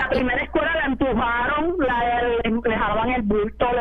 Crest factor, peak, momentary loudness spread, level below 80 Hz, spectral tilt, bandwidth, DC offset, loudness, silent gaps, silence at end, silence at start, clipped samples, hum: 14 dB; -8 dBFS; 1 LU; -36 dBFS; -8 dB/octave; 5.8 kHz; under 0.1%; -21 LUFS; none; 0 s; 0 s; under 0.1%; none